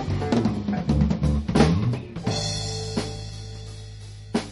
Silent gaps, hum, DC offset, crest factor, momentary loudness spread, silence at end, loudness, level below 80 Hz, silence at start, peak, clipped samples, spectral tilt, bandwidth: none; none; under 0.1%; 20 dB; 18 LU; 0 s; -24 LUFS; -34 dBFS; 0 s; -4 dBFS; under 0.1%; -6 dB/octave; 11.5 kHz